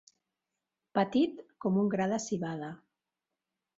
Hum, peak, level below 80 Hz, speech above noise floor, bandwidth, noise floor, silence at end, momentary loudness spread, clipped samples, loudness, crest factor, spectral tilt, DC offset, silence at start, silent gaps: none; -14 dBFS; -72 dBFS; 58 dB; 8 kHz; -89 dBFS; 1 s; 12 LU; under 0.1%; -32 LUFS; 20 dB; -6 dB/octave; under 0.1%; 0.95 s; none